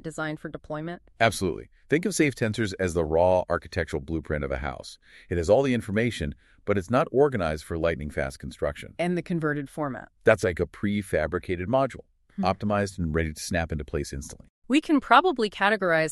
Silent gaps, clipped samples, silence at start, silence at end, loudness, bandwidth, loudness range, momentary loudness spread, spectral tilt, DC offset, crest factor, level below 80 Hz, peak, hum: 14.50-14.62 s; under 0.1%; 0.05 s; 0 s; -26 LUFS; 13 kHz; 3 LU; 13 LU; -5.5 dB/octave; under 0.1%; 22 dB; -44 dBFS; -4 dBFS; none